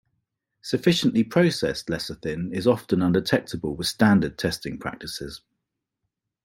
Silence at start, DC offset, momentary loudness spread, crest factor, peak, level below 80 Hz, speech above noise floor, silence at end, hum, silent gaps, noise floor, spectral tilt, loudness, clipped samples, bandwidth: 0.65 s; under 0.1%; 13 LU; 22 dB; -4 dBFS; -54 dBFS; 58 dB; 1.05 s; none; none; -82 dBFS; -5.5 dB/octave; -24 LUFS; under 0.1%; 16.5 kHz